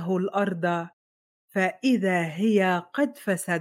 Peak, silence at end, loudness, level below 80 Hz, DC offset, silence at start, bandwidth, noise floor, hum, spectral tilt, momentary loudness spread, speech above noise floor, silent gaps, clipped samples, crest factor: -10 dBFS; 0 s; -25 LUFS; -80 dBFS; under 0.1%; 0 s; 16.5 kHz; under -90 dBFS; none; -6 dB/octave; 7 LU; over 65 dB; 0.93-1.48 s; under 0.1%; 16 dB